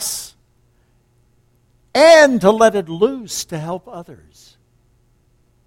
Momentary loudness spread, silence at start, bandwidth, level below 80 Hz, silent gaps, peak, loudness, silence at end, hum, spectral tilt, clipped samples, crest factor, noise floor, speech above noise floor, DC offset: 23 LU; 0 s; 16.5 kHz; -54 dBFS; none; 0 dBFS; -14 LUFS; 1.55 s; none; -3.5 dB/octave; under 0.1%; 18 dB; -58 dBFS; 43 dB; under 0.1%